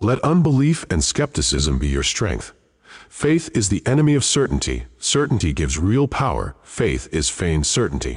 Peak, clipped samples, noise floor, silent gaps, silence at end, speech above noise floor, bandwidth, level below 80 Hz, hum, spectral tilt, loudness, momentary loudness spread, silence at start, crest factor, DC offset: -8 dBFS; under 0.1%; -46 dBFS; none; 0 s; 27 dB; 11.5 kHz; -30 dBFS; none; -4.5 dB/octave; -19 LUFS; 7 LU; 0 s; 12 dB; under 0.1%